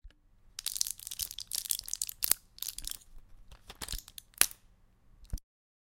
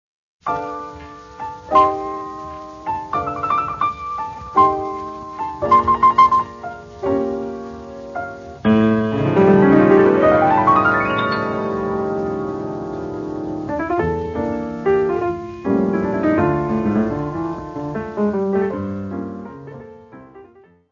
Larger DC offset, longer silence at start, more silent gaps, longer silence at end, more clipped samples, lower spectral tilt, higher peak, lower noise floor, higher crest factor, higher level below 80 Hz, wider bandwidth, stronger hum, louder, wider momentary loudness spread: neither; second, 0.05 s vs 0.45 s; neither; first, 0.6 s vs 0.45 s; neither; second, 0.5 dB/octave vs -8 dB/octave; about the same, 0 dBFS vs 0 dBFS; first, -63 dBFS vs -48 dBFS; first, 38 dB vs 18 dB; about the same, -50 dBFS vs -46 dBFS; first, 17 kHz vs 7.2 kHz; neither; second, -34 LUFS vs -18 LUFS; about the same, 19 LU vs 18 LU